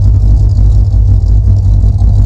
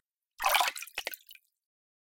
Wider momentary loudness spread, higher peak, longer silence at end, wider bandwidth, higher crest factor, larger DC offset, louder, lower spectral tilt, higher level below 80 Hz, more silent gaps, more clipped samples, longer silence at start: second, 1 LU vs 14 LU; first, 0 dBFS vs -8 dBFS; second, 0 s vs 0.8 s; second, 1.3 kHz vs 17 kHz; second, 6 dB vs 26 dB; neither; first, -9 LUFS vs -30 LUFS; first, -9.5 dB/octave vs 2.5 dB/octave; first, -8 dBFS vs -68 dBFS; neither; neither; second, 0 s vs 0.4 s